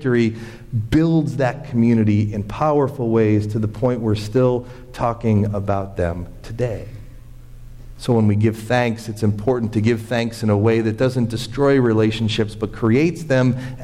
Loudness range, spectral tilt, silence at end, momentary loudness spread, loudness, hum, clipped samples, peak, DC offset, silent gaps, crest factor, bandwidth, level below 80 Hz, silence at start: 4 LU; -7.5 dB/octave; 0 s; 8 LU; -19 LUFS; none; under 0.1%; -6 dBFS; under 0.1%; none; 12 dB; 13 kHz; -40 dBFS; 0 s